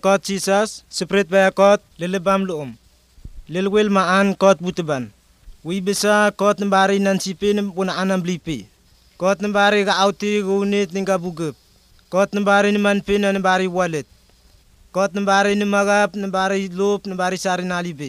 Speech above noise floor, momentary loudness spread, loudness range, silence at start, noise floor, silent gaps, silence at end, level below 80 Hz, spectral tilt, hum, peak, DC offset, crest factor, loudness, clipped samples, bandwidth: 34 dB; 11 LU; 2 LU; 0.05 s; -53 dBFS; none; 0 s; -52 dBFS; -4.5 dB/octave; none; -2 dBFS; under 0.1%; 18 dB; -19 LUFS; under 0.1%; 14.5 kHz